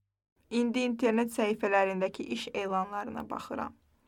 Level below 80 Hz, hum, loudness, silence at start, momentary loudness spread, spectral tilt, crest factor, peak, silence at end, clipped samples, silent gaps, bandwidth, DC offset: -70 dBFS; none; -31 LUFS; 0.5 s; 11 LU; -5 dB/octave; 18 dB; -14 dBFS; 0.35 s; under 0.1%; none; 16.5 kHz; under 0.1%